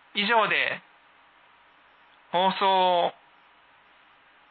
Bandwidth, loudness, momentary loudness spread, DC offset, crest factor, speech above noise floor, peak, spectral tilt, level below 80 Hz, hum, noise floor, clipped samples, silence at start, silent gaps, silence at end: 4.7 kHz; -24 LUFS; 9 LU; under 0.1%; 18 dB; 34 dB; -10 dBFS; -8 dB/octave; -84 dBFS; none; -58 dBFS; under 0.1%; 0.15 s; none; 1.4 s